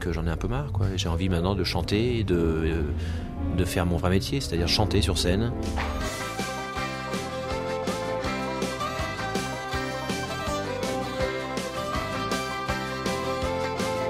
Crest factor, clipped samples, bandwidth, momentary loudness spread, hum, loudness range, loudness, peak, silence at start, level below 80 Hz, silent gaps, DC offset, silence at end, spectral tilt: 20 dB; under 0.1%; 16 kHz; 6 LU; none; 4 LU; -28 LUFS; -8 dBFS; 0 s; -38 dBFS; none; under 0.1%; 0 s; -5 dB/octave